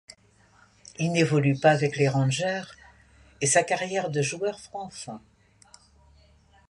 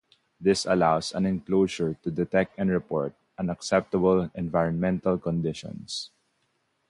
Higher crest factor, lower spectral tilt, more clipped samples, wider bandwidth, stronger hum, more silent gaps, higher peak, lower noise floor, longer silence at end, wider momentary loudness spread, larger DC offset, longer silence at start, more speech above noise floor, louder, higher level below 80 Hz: about the same, 20 dB vs 18 dB; second, -4.5 dB/octave vs -6 dB/octave; neither; about the same, 11.5 kHz vs 11.5 kHz; neither; neither; about the same, -6 dBFS vs -8 dBFS; second, -59 dBFS vs -73 dBFS; first, 1.5 s vs 0.85 s; first, 18 LU vs 11 LU; neither; first, 1 s vs 0.4 s; second, 34 dB vs 47 dB; about the same, -25 LUFS vs -26 LUFS; second, -62 dBFS vs -54 dBFS